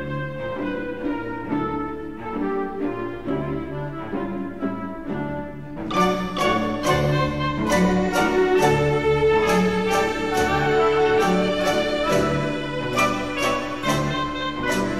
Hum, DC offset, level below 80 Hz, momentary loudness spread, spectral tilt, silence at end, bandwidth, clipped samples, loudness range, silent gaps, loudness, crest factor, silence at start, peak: none; 0.8%; -42 dBFS; 10 LU; -5.5 dB/octave; 0 s; 15.5 kHz; under 0.1%; 8 LU; none; -22 LUFS; 16 dB; 0 s; -6 dBFS